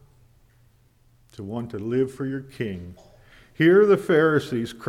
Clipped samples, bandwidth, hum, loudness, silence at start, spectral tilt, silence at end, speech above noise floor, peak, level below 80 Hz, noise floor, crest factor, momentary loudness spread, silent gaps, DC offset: under 0.1%; 13.5 kHz; none; -22 LUFS; 1.4 s; -7 dB/octave; 0 s; 37 dB; -6 dBFS; -58 dBFS; -59 dBFS; 18 dB; 18 LU; none; under 0.1%